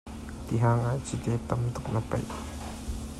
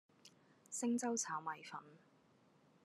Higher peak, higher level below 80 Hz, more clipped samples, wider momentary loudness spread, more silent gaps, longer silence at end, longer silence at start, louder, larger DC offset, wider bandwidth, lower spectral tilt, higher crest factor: first, -14 dBFS vs -28 dBFS; first, -42 dBFS vs under -90 dBFS; neither; about the same, 13 LU vs 13 LU; neither; second, 0 s vs 0.85 s; second, 0.05 s vs 0.25 s; first, -31 LUFS vs -42 LUFS; neither; about the same, 13 kHz vs 13 kHz; first, -7 dB/octave vs -3 dB/octave; about the same, 16 dB vs 18 dB